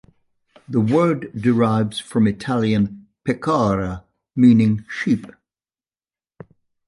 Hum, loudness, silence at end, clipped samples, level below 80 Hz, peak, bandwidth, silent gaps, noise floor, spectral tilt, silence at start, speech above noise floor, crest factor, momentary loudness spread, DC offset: none; -19 LUFS; 1.6 s; under 0.1%; -48 dBFS; -4 dBFS; 11.5 kHz; none; under -90 dBFS; -7.5 dB/octave; 0.7 s; over 72 dB; 16 dB; 10 LU; under 0.1%